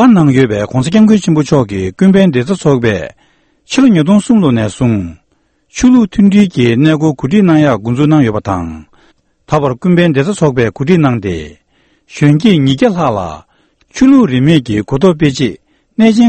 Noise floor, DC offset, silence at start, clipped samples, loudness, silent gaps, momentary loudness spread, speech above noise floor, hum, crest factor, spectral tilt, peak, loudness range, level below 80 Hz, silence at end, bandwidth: -57 dBFS; under 0.1%; 0 s; 0.4%; -10 LUFS; none; 10 LU; 48 dB; none; 10 dB; -7 dB/octave; 0 dBFS; 3 LU; -38 dBFS; 0 s; 8.8 kHz